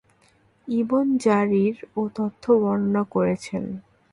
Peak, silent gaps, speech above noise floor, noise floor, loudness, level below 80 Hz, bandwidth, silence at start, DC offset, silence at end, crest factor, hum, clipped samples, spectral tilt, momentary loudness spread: -6 dBFS; none; 38 dB; -60 dBFS; -23 LUFS; -60 dBFS; 11 kHz; 0.65 s; under 0.1%; 0.3 s; 16 dB; none; under 0.1%; -7.5 dB/octave; 11 LU